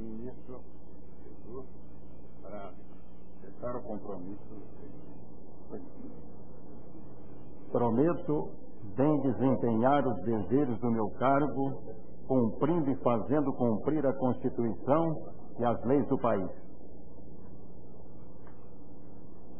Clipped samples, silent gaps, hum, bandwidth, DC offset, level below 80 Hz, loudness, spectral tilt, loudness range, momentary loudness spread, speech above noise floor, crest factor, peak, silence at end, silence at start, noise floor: under 0.1%; none; 60 Hz at -55 dBFS; 3.4 kHz; 2%; -58 dBFS; -31 LUFS; -8.5 dB/octave; 18 LU; 24 LU; 23 dB; 22 dB; -12 dBFS; 0 s; 0 s; -53 dBFS